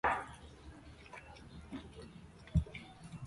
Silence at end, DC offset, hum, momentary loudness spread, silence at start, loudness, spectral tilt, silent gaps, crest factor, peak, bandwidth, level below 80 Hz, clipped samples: 0 s; under 0.1%; none; 18 LU; 0.05 s; -43 LUFS; -6.5 dB/octave; none; 22 dB; -20 dBFS; 11.5 kHz; -50 dBFS; under 0.1%